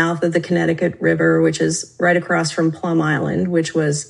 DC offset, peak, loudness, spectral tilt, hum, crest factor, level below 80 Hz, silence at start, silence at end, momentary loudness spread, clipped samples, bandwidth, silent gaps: under 0.1%; -2 dBFS; -18 LUFS; -5.5 dB/octave; none; 16 dB; -58 dBFS; 0 s; 0.05 s; 4 LU; under 0.1%; 11.5 kHz; none